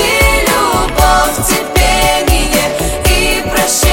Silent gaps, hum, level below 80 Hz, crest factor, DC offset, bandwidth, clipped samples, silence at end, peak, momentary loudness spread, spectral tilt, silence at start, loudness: none; none; -18 dBFS; 10 dB; under 0.1%; 17 kHz; under 0.1%; 0 s; 0 dBFS; 3 LU; -3 dB/octave; 0 s; -11 LUFS